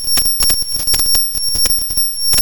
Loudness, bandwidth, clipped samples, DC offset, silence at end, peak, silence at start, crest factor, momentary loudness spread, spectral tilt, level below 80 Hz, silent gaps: -12 LUFS; 17.5 kHz; under 0.1%; 3%; 0 s; 0 dBFS; 0 s; 14 dB; 3 LU; 0.5 dB/octave; -30 dBFS; none